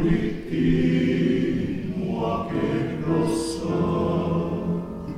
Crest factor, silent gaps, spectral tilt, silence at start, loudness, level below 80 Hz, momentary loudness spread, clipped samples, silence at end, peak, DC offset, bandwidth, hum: 16 dB; none; -7.5 dB/octave; 0 s; -24 LUFS; -40 dBFS; 6 LU; under 0.1%; 0 s; -8 dBFS; under 0.1%; 12 kHz; none